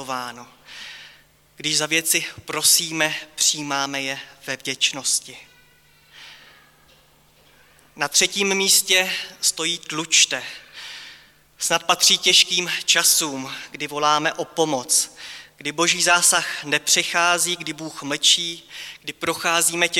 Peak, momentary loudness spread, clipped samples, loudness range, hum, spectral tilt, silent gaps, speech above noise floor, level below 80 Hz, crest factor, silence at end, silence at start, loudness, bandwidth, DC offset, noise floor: -4 dBFS; 18 LU; under 0.1%; 8 LU; none; 0 dB/octave; none; 34 dB; -66 dBFS; 18 dB; 0 s; 0 s; -19 LUFS; 18 kHz; under 0.1%; -55 dBFS